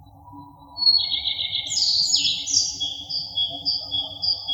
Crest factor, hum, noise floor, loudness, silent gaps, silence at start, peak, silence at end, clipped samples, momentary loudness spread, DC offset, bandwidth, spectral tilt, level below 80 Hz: 20 dB; none; -44 dBFS; -20 LUFS; none; 0 s; -4 dBFS; 0 s; under 0.1%; 9 LU; under 0.1%; over 20 kHz; 1 dB/octave; -56 dBFS